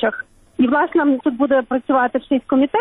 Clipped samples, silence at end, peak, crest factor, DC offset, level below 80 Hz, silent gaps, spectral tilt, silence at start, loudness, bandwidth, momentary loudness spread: under 0.1%; 0 s; -6 dBFS; 12 dB; under 0.1%; -54 dBFS; none; -7.5 dB/octave; 0 s; -18 LUFS; 3.9 kHz; 6 LU